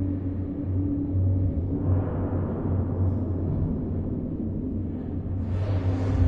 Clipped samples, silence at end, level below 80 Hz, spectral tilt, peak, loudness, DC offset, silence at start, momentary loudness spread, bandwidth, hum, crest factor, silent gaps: under 0.1%; 0 s; -36 dBFS; -11 dB/octave; -10 dBFS; -28 LUFS; under 0.1%; 0 s; 5 LU; 3.7 kHz; none; 14 dB; none